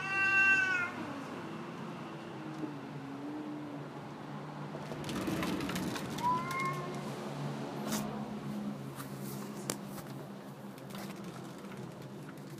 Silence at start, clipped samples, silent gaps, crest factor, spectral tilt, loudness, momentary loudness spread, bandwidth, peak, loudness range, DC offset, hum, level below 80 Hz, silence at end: 0 s; under 0.1%; none; 24 dB; -4.5 dB/octave; -36 LUFS; 14 LU; 15.5 kHz; -12 dBFS; 8 LU; under 0.1%; none; -68 dBFS; 0 s